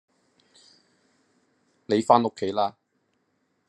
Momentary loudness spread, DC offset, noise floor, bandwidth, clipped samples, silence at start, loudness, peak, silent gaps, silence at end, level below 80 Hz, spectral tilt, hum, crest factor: 8 LU; under 0.1%; -72 dBFS; 11 kHz; under 0.1%; 1.9 s; -24 LUFS; -2 dBFS; none; 1 s; -78 dBFS; -6 dB/octave; none; 26 dB